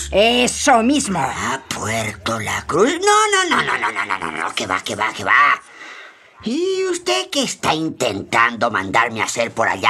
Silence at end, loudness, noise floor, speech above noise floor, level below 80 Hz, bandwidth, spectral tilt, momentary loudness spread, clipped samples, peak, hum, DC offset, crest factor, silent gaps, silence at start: 0 s; -17 LUFS; -41 dBFS; 23 dB; -48 dBFS; 15 kHz; -2.5 dB/octave; 9 LU; under 0.1%; 0 dBFS; none; under 0.1%; 18 dB; none; 0 s